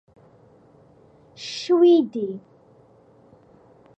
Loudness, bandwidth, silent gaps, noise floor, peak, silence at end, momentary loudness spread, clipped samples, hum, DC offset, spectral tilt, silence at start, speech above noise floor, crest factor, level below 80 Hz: -20 LUFS; 8 kHz; none; -54 dBFS; -8 dBFS; 1.6 s; 20 LU; under 0.1%; none; under 0.1%; -5.5 dB/octave; 1.4 s; 35 dB; 18 dB; -72 dBFS